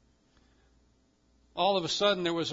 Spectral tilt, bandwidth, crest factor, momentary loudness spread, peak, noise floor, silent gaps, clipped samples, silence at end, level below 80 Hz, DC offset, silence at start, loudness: -3.5 dB/octave; 7.8 kHz; 20 dB; 5 LU; -12 dBFS; -68 dBFS; none; under 0.1%; 0 s; -68 dBFS; under 0.1%; 1.55 s; -28 LUFS